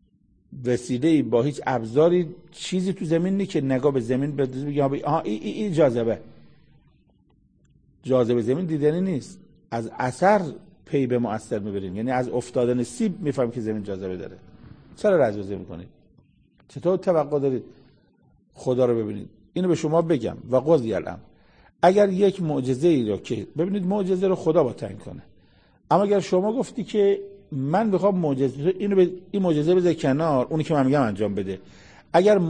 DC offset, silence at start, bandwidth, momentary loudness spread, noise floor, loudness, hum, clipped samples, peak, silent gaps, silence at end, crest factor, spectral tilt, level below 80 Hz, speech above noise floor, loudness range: 0.1%; 0.5 s; 9.8 kHz; 12 LU; -61 dBFS; -23 LUFS; none; under 0.1%; -2 dBFS; none; 0 s; 20 dB; -7.5 dB/octave; -58 dBFS; 39 dB; 5 LU